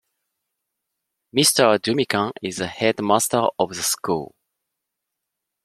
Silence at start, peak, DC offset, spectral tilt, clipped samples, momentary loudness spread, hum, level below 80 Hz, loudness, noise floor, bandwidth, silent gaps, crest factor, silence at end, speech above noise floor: 1.35 s; -2 dBFS; under 0.1%; -3 dB/octave; under 0.1%; 11 LU; none; -64 dBFS; -20 LUFS; -82 dBFS; 16 kHz; none; 22 dB; 1.4 s; 61 dB